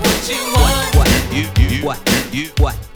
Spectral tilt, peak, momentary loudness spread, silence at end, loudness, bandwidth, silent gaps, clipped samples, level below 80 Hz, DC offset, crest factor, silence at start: -4 dB/octave; 0 dBFS; 5 LU; 0.05 s; -15 LUFS; over 20 kHz; none; under 0.1%; -18 dBFS; under 0.1%; 14 dB; 0 s